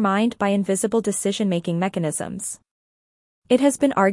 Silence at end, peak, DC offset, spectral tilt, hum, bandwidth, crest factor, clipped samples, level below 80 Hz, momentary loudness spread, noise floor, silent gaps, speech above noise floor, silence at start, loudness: 0 s; -4 dBFS; under 0.1%; -5 dB/octave; none; 12 kHz; 18 dB; under 0.1%; -62 dBFS; 10 LU; under -90 dBFS; 2.71-3.42 s; over 69 dB; 0 s; -22 LUFS